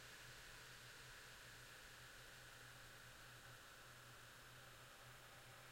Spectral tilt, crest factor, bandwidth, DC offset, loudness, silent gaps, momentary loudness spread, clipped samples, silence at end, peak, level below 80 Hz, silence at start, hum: -2 dB/octave; 12 dB; 16.5 kHz; under 0.1%; -59 LUFS; none; 2 LU; under 0.1%; 0 s; -48 dBFS; -74 dBFS; 0 s; none